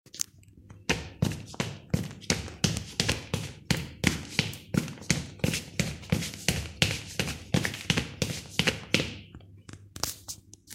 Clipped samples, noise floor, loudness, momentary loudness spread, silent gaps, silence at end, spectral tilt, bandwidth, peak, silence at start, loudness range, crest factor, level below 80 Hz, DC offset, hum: under 0.1%; -52 dBFS; -30 LUFS; 9 LU; none; 0 s; -3.5 dB/octave; 16.5 kHz; -2 dBFS; 0.15 s; 2 LU; 28 dB; -48 dBFS; under 0.1%; none